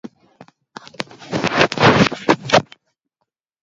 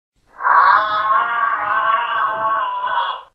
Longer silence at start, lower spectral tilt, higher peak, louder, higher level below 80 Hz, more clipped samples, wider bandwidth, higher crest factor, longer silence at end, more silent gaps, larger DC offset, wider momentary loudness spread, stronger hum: second, 0.05 s vs 0.4 s; first, -5 dB/octave vs -3.5 dB/octave; about the same, 0 dBFS vs 0 dBFS; about the same, -16 LUFS vs -16 LUFS; first, -50 dBFS vs -62 dBFS; neither; first, 8 kHz vs 5.8 kHz; about the same, 20 dB vs 16 dB; first, 1 s vs 0.1 s; neither; neither; first, 18 LU vs 8 LU; neither